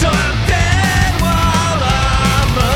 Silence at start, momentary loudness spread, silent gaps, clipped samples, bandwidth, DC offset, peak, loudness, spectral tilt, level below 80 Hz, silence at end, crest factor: 0 s; 2 LU; none; under 0.1%; 17.5 kHz; under 0.1%; -2 dBFS; -14 LUFS; -4.5 dB/octave; -20 dBFS; 0 s; 12 dB